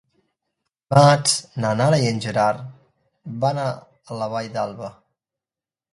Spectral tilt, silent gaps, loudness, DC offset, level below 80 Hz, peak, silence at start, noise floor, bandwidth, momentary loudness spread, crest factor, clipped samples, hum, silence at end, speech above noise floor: -5 dB/octave; none; -20 LUFS; under 0.1%; -60 dBFS; 0 dBFS; 0.9 s; under -90 dBFS; 11.5 kHz; 21 LU; 22 dB; under 0.1%; none; 1 s; over 70 dB